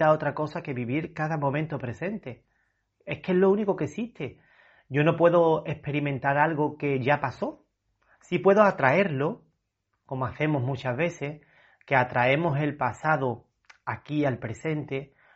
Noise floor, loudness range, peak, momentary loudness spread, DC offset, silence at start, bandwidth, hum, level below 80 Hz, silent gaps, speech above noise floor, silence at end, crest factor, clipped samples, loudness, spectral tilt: -78 dBFS; 4 LU; -4 dBFS; 15 LU; under 0.1%; 0 s; 8 kHz; none; -62 dBFS; none; 53 dB; 0.3 s; 22 dB; under 0.1%; -26 LUFS; -6 dB/octave